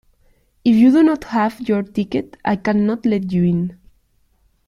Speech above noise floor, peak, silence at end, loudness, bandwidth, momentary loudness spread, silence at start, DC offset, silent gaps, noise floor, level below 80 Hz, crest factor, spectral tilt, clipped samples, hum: 43 dB; -4 dBFS; 0.95 s; -17 LUFS; 11.5 kHz; 10 LU; 0.65 s; under 0.1%; none; -60 dBFS; -52 dBFS; 14 dB; -8.5 dB/octave; under 0.1%; none